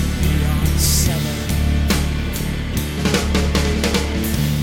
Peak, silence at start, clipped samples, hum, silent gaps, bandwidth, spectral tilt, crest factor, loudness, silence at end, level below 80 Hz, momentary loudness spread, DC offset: -2 dBFS; 0 s; under 0.1%; none; none; 17 kHz; -4.5 dB/octave; 16 dB; -19 LUFS; 0 s; -22 dBFS; 7 LU; under 0.1%